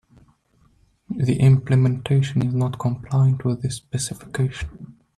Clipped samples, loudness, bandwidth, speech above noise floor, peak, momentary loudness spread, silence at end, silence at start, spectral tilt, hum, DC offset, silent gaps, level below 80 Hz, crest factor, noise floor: under 0.1%; -21 LUFS; 12 kHz; 40 dB; -6 dBFS; 10 LU; 0.25 s; 1.1 s; -7 dB/octave; none; under 0.1%; none; -46 dBFS; 16 dB; -60 dBFS